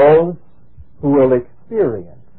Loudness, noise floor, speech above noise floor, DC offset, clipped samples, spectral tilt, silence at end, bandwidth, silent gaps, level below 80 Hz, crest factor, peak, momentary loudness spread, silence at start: -16 LUFS; -45 dBFS; 31 dB; 1%; under 0.1%; -12.5 dB/octave; 0.35 s; 4.1 kHz; none; -48 dBFS; 14 dB; 0 dBFS; 14 LU; 0 s